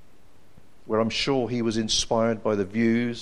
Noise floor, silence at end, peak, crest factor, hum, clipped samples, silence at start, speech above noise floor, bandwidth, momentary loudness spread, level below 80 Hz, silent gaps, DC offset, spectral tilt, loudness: -58 dBFS; 0 s; -10 dBFS; 16 dB; none; under 0.1%; 0.85 s; 33 dB; 11 kHz; 3 LU; -48 dBFS; none; 0.7%; -4 dB/octave; -24 LUFS